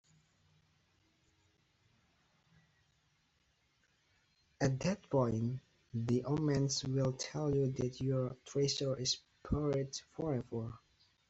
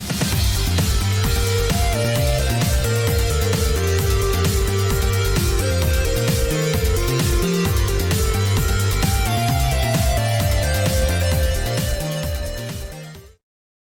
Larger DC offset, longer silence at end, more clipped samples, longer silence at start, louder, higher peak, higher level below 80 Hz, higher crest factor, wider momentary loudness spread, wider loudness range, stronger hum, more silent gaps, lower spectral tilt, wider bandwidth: neither; second, 0.5 s vs 0.65 s; neither; first, 4.6 s vs 0 s; second, -36 LUFS vs -20 LUFS; second, -20 dBFS vs -8 dBFS; second, -60 dBFS vs -24 dBFS; first, 18 dB vs 10 dB; first, 8 LU vs 3 LU; first, 5 LU vs 1 LU; neither; neither; about the same, -5.5 dB/octave vs -4.5 dB/octave; second, 8 kHz vs 17.5 kHz